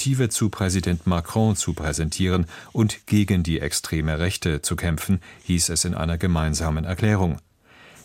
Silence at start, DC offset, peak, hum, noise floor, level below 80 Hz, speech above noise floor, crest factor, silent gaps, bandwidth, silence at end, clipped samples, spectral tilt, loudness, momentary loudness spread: 0 s; under 0.1%; -6 dBFS; none; -50 dBFS; -36 dBFS; 28 dB; 16 dB; none; 16.5 kHz; 0.05 s; under 0.1%; -5 dB/octave; -23 LUFS; 4 LU